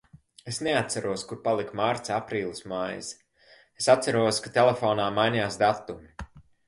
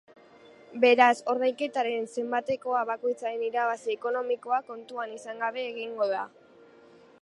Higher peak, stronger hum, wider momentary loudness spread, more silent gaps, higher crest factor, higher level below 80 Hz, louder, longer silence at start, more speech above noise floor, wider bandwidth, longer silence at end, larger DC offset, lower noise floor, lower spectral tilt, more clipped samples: about the same, -6 dBFS vs -6 dBFS; neither; first, 18 LU vs 14 LU; neither; about the same, 22 dB vs 24 dB; first, -58 dBFS vs -80 dBFS; about the same, -26 LUFS vs -28 LUFS; second, 0.45 s vs 0.7 s; first, 32 dB vs 27 dB; about the same, 11.5 kHz vs 11 kHz; second, 0.25 s vs 0.95 s; neither; about the same, -58 dBFS vs -55 dBFS; about the same, -4 dB/octave vs -3.5 dB/octave; neither